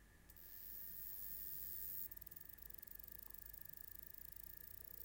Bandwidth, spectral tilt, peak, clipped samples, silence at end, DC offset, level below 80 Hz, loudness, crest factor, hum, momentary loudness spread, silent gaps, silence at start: 17 kHz; -2.5 dB/octave; -34 dBFS; under 0.1%; 0 s; under 0.1%; -68 dBFS; -50 LUFS; 20 dB; none; 8 LU; none; 0 s